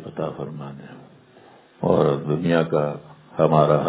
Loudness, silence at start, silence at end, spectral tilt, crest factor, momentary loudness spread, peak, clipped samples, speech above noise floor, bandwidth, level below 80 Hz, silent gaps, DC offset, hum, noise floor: -22 LUFS; 0 s; 0 s; -11.5 dB/octave; 20 dB; 19 LU; -4 dBFS; under 0.1%; 30 dB; 4 kHz; -54 dBFS; none; under 0.1%; none; -50 dBFS